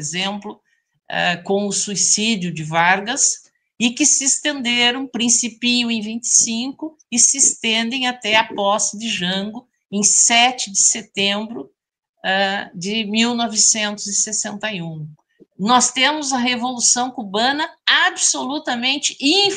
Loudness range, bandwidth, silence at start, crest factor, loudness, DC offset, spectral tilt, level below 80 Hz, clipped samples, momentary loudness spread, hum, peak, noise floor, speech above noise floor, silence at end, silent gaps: 3 LU; 11 kHz; 0 s; 20 dB; -16 LUFS; under 0.1%; -1 dB/octave; -66 dBFS; under 0.1%; 11 LU; none; 0 dBFS; -46 dBFS; 28 dB; 0 s; 12.09-12.14 s